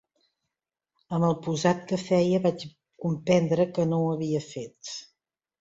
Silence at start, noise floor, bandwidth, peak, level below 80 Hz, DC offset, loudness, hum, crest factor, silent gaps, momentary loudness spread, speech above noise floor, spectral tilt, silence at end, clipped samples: 1.1 s; -87 dBFS; 8 kHz; -8 dBFS; -64 dBFS; under 0.1%; -26 LUFS; none; 18 dB; none; 15 LU; 62 dB; -6.5 dB/octave; 0.55 s; under 0.1%